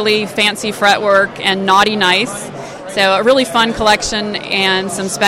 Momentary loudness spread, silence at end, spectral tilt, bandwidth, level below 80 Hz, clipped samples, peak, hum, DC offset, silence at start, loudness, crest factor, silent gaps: 9 LU; 0 s; -3 dB/octave; 16.5 kHz; -44 dBFS; under 0.1%; 0 dBFS; none; under 0.1%; 0 s; -13 LUFS; 14 dB; none